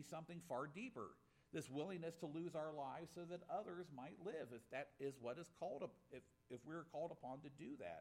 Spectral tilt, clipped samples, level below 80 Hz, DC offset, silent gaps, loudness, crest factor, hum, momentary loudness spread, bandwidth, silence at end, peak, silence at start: -6 dB/octave; under 0.1%; -86 dBFS; under 0.1%; none; -52 LUFS; 16 dB; none; 7 LU; 16 kHz; 0 s; -36 dBFS; 0 s